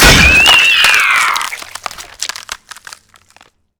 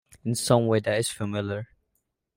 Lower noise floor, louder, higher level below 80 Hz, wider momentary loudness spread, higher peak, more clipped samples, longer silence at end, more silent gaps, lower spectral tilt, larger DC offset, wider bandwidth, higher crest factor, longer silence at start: second, -48 dBFS vs -77 dBFS; first, -6 LUFS vs -26 LUFS; first, -24 dBFS vs -62 dBFS; first, 22 LU vs 12 LU; first, 0 dBFS vs -8 dBFS; first, 0.6% vs under 0.1%; first, 1.25 s vs 0.7 s; neither; second, -1.5 dB/octave vs -5 dB/octave; neither; first, over 20 kHz vs 16 kHz; second, 12 dB vs 20 dB; second, 0 s vs 0.25 s